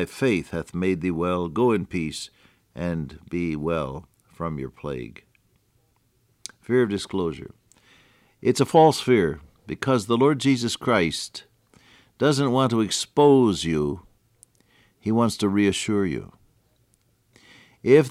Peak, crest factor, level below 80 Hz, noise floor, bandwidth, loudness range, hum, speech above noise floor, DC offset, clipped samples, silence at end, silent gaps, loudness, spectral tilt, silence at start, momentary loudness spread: -4 dBFS; 20 dB; -52 dBFS; -66 dBFS; 15 kHz; 9 LU; none; 43 dB; under 0.1%; under 0.1%; 0 s; none; -23 LUFS; -5.5 dB/octave; 0 s; 17 LU